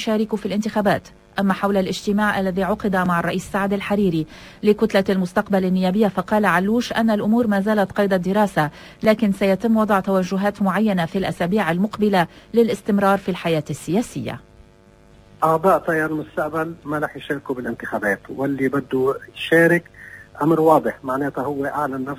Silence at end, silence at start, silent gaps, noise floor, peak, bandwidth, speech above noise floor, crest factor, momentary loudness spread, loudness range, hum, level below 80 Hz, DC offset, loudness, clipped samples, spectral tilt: 0 s; 0 s; none; -50 dBFS; -2 dBFS; 16 kHz; 30 dB; 18 dB; 8 LU; 4 LU; none; -50 dBFS; under 0.1%; -20 LUFS; under 0.1%; -6.5 dB/octave